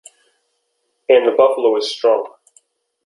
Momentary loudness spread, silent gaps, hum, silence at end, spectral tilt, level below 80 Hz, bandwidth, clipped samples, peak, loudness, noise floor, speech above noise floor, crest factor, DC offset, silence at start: 13 LU; none; none; 0.8 s; -3 dB/octave; -68 dBFS; 11.5 kHz; under 0.1%; 0 dBFS; -15 LUFS; -69 dBFS; 55 dB; 18 dB; under 0.1%; 1.1 s